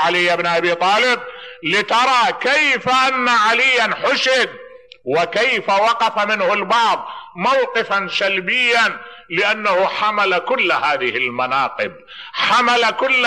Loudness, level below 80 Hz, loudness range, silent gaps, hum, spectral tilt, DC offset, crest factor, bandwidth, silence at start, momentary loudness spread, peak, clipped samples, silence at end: -16 LUFS; -64 dBFS; 3 LU; none; none; -2.5 dB/octave; 0.2%; 12 dB; 12 kHz; 0 s; 8 LU; -4 dBFS; under 0.1%; 0 s